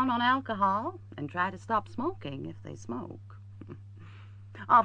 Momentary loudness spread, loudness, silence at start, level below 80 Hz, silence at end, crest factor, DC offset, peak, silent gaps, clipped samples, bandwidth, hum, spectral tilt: 22 LU; -31 LUFS; 0 s; -62 dBFS; 0 s; 22 dB; under 0.1%; -10 dBFS; none; under 0.1%; 9 kHz; none; -6 dB/octave